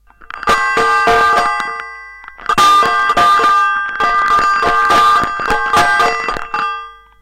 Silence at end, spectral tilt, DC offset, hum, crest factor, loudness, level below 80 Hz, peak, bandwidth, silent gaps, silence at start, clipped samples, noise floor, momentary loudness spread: 0.3 s; -2 dB/octave; under 0.1%; none; 10 dB; -12 LUFS; -38 dBFS; -4 dBFS; 16.5 kHz; none; 0.2 s; under 0.1%; -33 dBFS; 14 LU